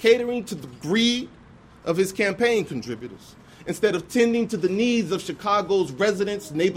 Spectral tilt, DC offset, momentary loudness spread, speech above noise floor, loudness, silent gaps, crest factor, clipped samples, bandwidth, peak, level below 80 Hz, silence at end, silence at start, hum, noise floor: -4.5 dB/octave; under 0.1%; 14 LU; 26 dB; -23 LUFS; none; 18 dB; under 0.1%; 16 kHz; -6 dBFS; -58 dBFS; 0 s; 0 s; none; -48 dBFS